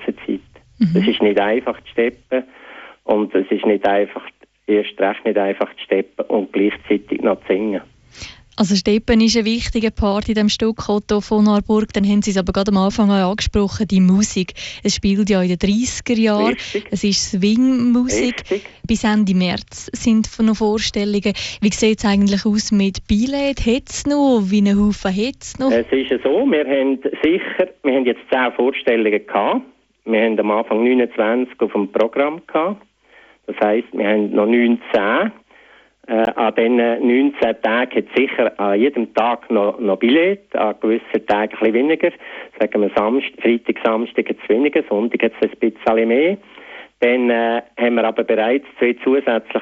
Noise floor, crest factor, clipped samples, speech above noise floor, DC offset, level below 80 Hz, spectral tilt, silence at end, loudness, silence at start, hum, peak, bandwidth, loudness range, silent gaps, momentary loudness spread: -50 dBFS; 14 dB; under 0.1%; 33 dB; under 0.1%; -40 dBFS; -5 dB/octave; 0 s; -17 LUFS; 0 s; none; -2 dBFS; 8.2 kHz; 3 LU; none; 7 LU